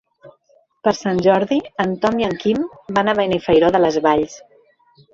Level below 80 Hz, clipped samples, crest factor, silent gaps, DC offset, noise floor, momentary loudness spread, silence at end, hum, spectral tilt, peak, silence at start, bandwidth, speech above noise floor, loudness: -50 dBFS; under 0.1%; 16 dB; none; under 0.1%; -58 dBFS; 7 LU; 0.75 s; none; -6 dB/octave; -2 dBFS; 0.25 s; 7.8 kHz; 41 dB; -18 LUFS